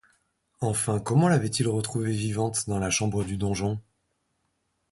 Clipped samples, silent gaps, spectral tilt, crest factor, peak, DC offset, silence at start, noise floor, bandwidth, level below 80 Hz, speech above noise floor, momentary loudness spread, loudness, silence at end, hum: under 0.1%; none; -5 dB/octave; 18 dB; -8 dBFS; under 0.1%; 0.6 s; -75 dBFS; 12 kHz; -50 dBFS; 49 dB; 7 LU; -26 LUFS; 1.1 s; none